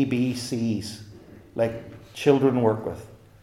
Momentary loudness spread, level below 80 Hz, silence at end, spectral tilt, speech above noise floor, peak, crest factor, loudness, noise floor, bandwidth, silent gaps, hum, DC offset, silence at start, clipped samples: 21 LU; -58 dBFS; 0.25 s; -6.5 dB/octave; 23 dB; -6 dBFS; 20 dB; -25 LUFS; -47 dBFS; 15 kHz; none; none; under 0.1%; 0 s; under 0.1%